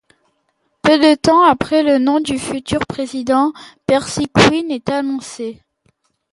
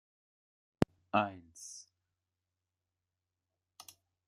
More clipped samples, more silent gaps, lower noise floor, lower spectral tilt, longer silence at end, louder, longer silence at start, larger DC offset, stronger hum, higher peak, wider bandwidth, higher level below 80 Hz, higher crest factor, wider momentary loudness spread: neither; neither; second, -66 dBFS vs -90 dBFS; about the same, -5 dB/octave vs -5.5 dB/octave; second, 0.8 s vs 2.45 s; first, -15 LUFS vs -35 LUFS; about the same, 0.85 s vs 0.8 s; neither; neither; first, 0 dBFS vs -10 dBFS; second, 11.5 kHz vs 15 kHz; first, -46 dBFS vs -66 dBFS; second, 16 dB vs 32 dB; second, 12 LU vs 22 LU